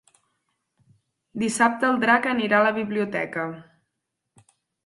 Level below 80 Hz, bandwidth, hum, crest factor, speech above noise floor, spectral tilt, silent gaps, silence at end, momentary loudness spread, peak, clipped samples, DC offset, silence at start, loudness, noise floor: -68 dBFS; 11.5 kHz; none; 22 dB; 58 dB; -4.5 dB/octave; none; 1.25 s; 12 LU; -4 dBFS; under 0.1%; under 0.1%; 1.35 s; -22 LUFS; -81 dBFS